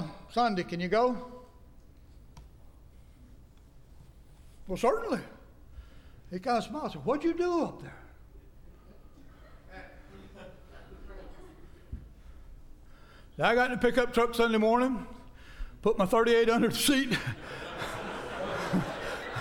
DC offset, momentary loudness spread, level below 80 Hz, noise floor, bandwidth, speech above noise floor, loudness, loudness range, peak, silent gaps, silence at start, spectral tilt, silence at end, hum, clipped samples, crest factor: under 0.1%; 24 LU; -50 dBFS; -54 dBFS; 18.5 kHz; 26 dB; -29 LUFS; 24 LU; -12 dBFS; none; 0 s; -4.5 dB/octave; 0 s; none; under 0.1%; 20 dB